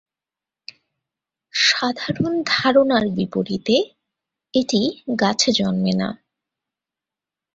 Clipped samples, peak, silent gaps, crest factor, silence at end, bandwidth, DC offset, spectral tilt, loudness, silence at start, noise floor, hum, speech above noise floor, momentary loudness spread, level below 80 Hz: under 0.1%; -2 dBFS; none; 18 dB; 1.4 s; 8 kHz; under 0.1%; -4 dB/octave; -19 LUFS; 1.55 s; -89 dBFS; none; 70 dB; 8 LU; -58 dBFS